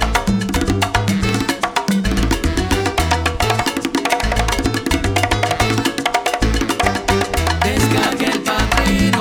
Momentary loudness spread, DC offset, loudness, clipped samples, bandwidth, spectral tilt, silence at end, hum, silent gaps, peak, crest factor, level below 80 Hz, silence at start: 3 LU; under 0.1%; -17 LUFS; under 0.1%; 19.5 kHz; -4.5 dB/octave; 0 s; none; none; -2 dBFS; 16 dB; -24 dBFS; 0 s